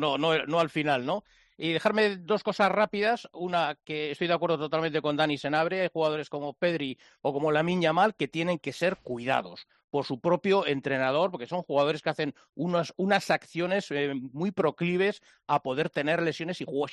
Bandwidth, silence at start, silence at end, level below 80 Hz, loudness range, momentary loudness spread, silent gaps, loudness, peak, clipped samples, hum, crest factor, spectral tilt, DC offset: 11.5 kHz; 0 s; 0 s; -70 dBFS; 1 LU; 8 LU; 9.84-9.88 s, 12.49-12.53 s; -28 LUFS; -10 dBFS; under 0.1%; none; 18 dB; -6 dB/octave; under 0.1%